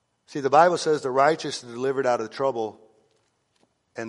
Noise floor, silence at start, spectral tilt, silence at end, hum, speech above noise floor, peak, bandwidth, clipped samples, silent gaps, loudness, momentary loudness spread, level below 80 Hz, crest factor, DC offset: -69 dBFS; 0.3 s; -4.5 dB/octave; 0 s; none; 46 dB; -4 dBFS; 11.5 kHz; under 0.1%; none; -23 LUFS; 14 LU; -74 dBFS; 20 dB; under 0.1%